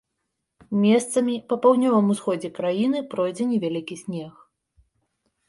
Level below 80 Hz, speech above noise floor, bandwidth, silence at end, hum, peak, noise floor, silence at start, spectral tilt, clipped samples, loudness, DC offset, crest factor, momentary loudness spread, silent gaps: -68 dBFS; 57 dB; 11.5 kHz; 1.2 s; none; -6 dBFS; -79 dBFS; 0.7 s; -6 dB/octave; under 0.1%; -23 LUFS; under 0.1%; 18 dB; 14 LU; none